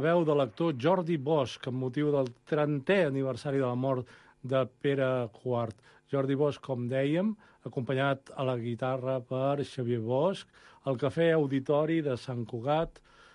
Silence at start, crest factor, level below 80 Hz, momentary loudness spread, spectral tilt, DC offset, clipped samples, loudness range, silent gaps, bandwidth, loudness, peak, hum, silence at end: 0 s; 16 dB; -64 dBFS; 8 LU; -7.5 dB/octave; under 0.1%; under 0.1%; 2 LU; none; 11 kHz; -30 LUFS; -14 dBFS; none; 0.45 s